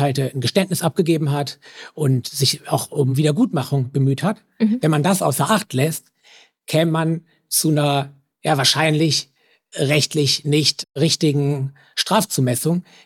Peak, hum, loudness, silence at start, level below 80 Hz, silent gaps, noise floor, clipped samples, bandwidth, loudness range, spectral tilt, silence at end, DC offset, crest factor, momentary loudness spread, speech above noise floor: -2 dBFS; none; -19 LUFS; 0 s; -66 dBFS; none; -51 dBFS; under 0.1%; 17 kHz; 2 LU; -4.5 dB/octave; 0.25 s; under 0.1%; 16 dB; 8 LU; 32 dB